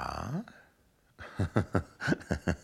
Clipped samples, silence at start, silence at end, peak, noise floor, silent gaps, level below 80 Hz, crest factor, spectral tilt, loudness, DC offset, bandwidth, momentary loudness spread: under 0.1%; 0 s; 0 s; -10 dBFS; -67 dBFS; none; -50 dBFS; 24 dB; -6.5 dB/octave; -34 LUFS; under 0.1%; 13.5 kHz; 16 LU